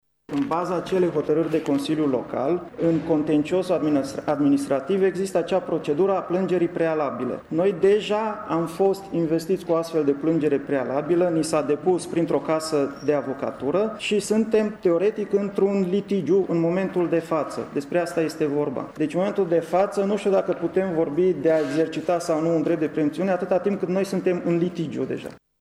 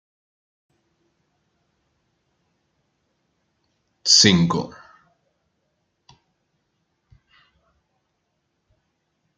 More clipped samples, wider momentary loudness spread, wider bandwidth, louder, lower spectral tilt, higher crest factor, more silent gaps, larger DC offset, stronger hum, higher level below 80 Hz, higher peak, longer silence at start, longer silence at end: neither; second, 5 LU vs 16 LU; first, 13 kHz vs 9.4 kHz; second, -23 LUFS vs -16 LUFS; first, -6.5 dB/octave vs -3 dB/octave; second, 14 dB vs 26 dB; neither; neither; neither; about the same, -60 dBFS vs -62 dBFS; second, -8 dBFS vs -2 dBFS; second, 0.3 s vs 4.05 s; second, 0.25 s vs 4.7 s